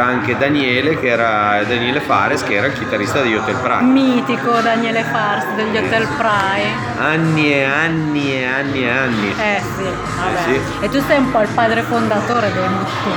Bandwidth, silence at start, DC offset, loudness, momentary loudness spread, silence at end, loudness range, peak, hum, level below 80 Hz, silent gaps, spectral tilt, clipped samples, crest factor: over 20 kHz; 0 s; under 0.1%; -16 LUFS; 4 LU; 0 s; 1 LU; 0 dBFS; none; -44 dBFS; none; -5.5 dB/octave; under 0.1%; 16 dB